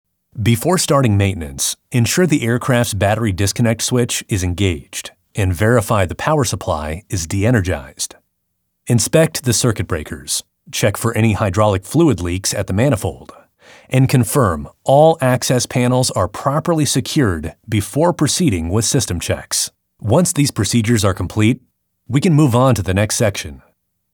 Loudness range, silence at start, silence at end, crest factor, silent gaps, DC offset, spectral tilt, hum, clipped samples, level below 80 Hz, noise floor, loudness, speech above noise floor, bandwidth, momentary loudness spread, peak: 3 LU; 0.35 s; 0.55 s; 16 dB; none; under 0.1%; -5 dB/octave; none; under 0.1%; -44 dBFS; -70 dBFS; -16 LUFS; 55 dB; over 20 kHz; 9 LU; 0 dBFS